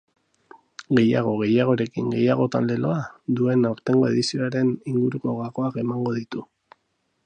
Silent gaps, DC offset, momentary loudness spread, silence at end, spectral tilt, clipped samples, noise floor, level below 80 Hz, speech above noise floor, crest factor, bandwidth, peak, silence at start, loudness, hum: none; under 0.1%; 8 LU; 0.8 s; -7 dB/octave; under 0.1%; -72 dBFS; -64 dBFS; 50 dB; 18 dB; 9.4 kHz; -4 dBFS; 0.8 s; -23 LUFS; none